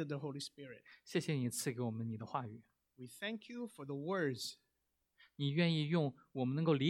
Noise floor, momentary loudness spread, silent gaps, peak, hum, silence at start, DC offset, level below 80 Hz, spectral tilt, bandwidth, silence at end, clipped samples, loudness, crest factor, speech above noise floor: -85 dBFS; 18 LU; none; -20 dBFS; none; 0 s; under 0.1%; -82 dBFS; -5.5 dB/octave; 16.5 kHz; 0 s; under 0.1%; -40 LUFS; 20 dB; 46 dB